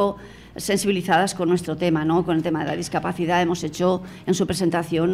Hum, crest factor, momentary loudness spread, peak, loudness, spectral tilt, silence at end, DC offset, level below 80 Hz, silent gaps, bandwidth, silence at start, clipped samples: none; 14 dB; 6 LU; -8 dBFS; -22 LUFS; -5.5 dB/octave; 0 s; under 0.1%; -52 dBFS; none; 16 kHz; 0 s; under 0.1%